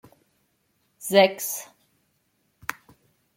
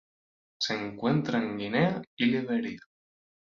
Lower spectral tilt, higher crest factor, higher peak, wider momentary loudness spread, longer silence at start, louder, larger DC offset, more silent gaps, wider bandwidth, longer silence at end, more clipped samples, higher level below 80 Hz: second, -3 dB/octave vs -6 dB/octave; about the same, 24 dB vs 20 dB; first, -4 dBFS vs -12 dBFS; first, 18 LU vs 6 LU; first, 1 s vs 0.6 s; first, -24 LUFS vs -29 LUFS; neither; second, none vs 2.07-2.17 s; first, 16.5 kHz vs 7.4 kHz; second, 0.65 s vs 0.8 s; neither; about the same, -72 dBFS vs -68 dBFS